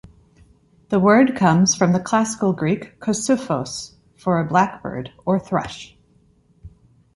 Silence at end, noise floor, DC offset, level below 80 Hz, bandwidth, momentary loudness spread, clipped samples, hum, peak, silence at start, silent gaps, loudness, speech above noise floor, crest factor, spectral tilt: 0.45 s; -57 dBFS; under 0.1%; -52 dBFS; 11.5 kHz; 15 LU; under 0.1%; none; -2 dBFS; 0.9 s; none; -19 LUFS; 38 dB; 18 dB; -5 dB/octave